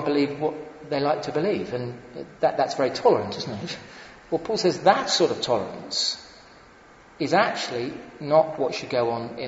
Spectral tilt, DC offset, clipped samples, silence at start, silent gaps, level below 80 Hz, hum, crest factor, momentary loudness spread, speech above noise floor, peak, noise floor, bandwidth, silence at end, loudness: -4 dB/octave; under 0.1%; under 0.1%; 0 s; none; -60 dBFS; none; 22 dB; 14 LU; 26 dB; -4 dBFS; -50 dBFS; 8 kHz; 0 s; -24 LUFS